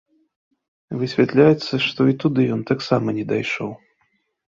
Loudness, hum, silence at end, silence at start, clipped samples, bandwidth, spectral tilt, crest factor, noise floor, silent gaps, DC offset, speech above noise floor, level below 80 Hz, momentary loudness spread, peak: -19 LUFS; none; 0.75 s; 0.9 s; under 0.1%; 7.6 kHz; -7 dB/octave; 20 dB; -68 dBFS; none; under 0.1%; 49 dB; -58 dBFS; 12 LU; -2 dBFS